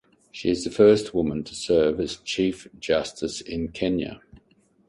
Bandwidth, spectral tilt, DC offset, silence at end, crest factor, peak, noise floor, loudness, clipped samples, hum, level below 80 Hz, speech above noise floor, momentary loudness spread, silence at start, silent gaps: 11.5 kHz; -5 dB/octave; under 0.1%; 0.5 s; 20 dB; -6 dBFS; -62 dBFS; -24 LUFS; under 0.1%; none; -50 dBFS; 38 dB; 13 LU; 0.35 s; none